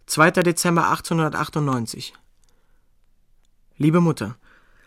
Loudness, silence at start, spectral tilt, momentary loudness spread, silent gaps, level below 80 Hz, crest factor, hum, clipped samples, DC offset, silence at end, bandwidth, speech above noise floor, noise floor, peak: -20 LUFS; 0.1 s; -5 dB/octave; 15 LU; none; -56 dBFS; 20 dB; none; under 0.1%; under 0.1%; 0.5 s; 16.5 kHz; 39 dB; -59 dBFS; -2 dBFS